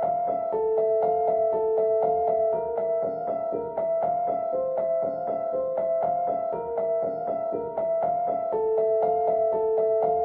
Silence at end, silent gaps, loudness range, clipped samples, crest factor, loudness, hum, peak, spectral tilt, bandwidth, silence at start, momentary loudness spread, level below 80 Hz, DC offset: 0 s; none; 3 LU; under 0.1%; 12 dB; -26 LUFS; none; -14 dBFS; -10.5 dB/octave; 2.8 kHz; 0 s; 5 LU; -62 dBFS; under 0.1%